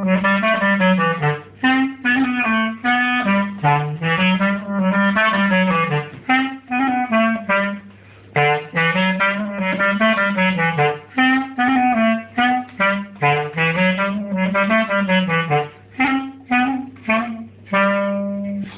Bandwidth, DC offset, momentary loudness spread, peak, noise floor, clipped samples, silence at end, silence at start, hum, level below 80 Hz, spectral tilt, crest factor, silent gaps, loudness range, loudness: 4 kHz; under 0.1%; 6 LU; -2 dBFS; -43 dBFS; under 0.1%; 0 s; 0 s; none; -56 dBFS; -9.5 dB/octave; 16 dB; none; 2 LU; -18 LUFS